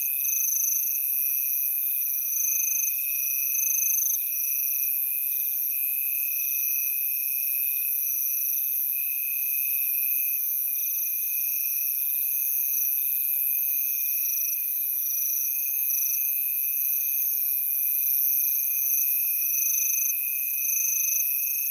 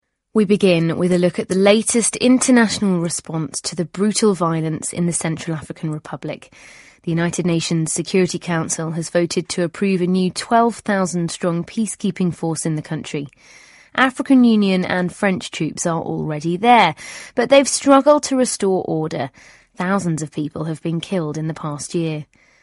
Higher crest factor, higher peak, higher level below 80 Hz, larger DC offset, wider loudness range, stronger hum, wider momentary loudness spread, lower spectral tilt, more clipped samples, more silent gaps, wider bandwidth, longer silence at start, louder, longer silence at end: about the same, 16 dB vs 18 dB; second, -10 dBFS vs 0 dBFS; second, under -90 dBFS vs -56 dBFS; neither; second, 2 LU vs 7 LU; neither; second, 3 LU vs 12 LU; second, 12 dB/octave vs -5 dB/octave; neither; neither; first, 17.5 kHz vs 11.5 kHz; second, 0 s vs 0.35 s; second, -23 LUFS vs -18 LUFS; second, 0 s vs 0.4 s